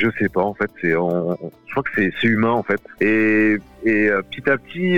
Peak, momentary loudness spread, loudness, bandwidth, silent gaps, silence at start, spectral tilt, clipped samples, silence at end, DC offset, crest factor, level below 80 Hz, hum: -6 dBFS; 8 LU; -19 LUFS; 6.8 kHz; none; 0 s; -8 dB/octave; under 0.1%; 0 s; 0.6%; 14 dB; -54 dBFS; none